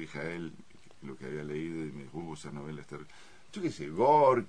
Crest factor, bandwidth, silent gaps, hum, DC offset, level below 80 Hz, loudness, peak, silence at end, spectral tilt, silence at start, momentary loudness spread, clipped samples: 20 dB; 10.5 kHz; none; none; 0.3%; -66 dBFS; -33 LUFS; -12 dBFS; 0 s; -6.5 dB/octave; 0 s; 22 LU; under 0.1%